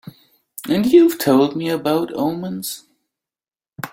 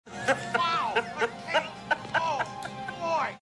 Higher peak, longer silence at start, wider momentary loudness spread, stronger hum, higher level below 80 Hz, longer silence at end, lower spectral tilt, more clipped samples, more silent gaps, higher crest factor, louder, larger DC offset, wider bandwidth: first, -2 dBFS vs -12 dBFS; about the same, 0.05 s vs 0.05 s; first, 20 LU vs 8 LU; neither; first, -60 dBFS vs -66 dBFS; about the same, 0.05 s vs 0.05 s; first, -5.5 dB/octave vs -3.5 dB/octave; neither; neither; about the same, 18 dB vs 18 dB; first, -17 LUFS vs -29 LUFS; neither; first, 16.5 kHz vs 12 kHz